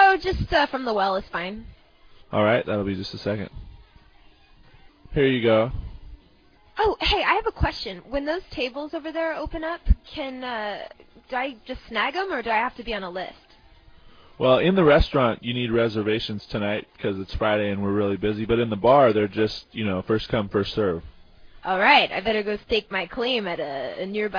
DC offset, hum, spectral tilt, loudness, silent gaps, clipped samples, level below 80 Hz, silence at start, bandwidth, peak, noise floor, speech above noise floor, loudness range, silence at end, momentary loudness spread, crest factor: under 0.1%; none; -7 dB/octave; -24 LUFS; none; under 0.1%; -38 dBFS; 0 s; 5.2 kHz; -4 dBFS; -56 dBFS; 32 dB; 6 LU; 0 s; 14 LU; 20 dB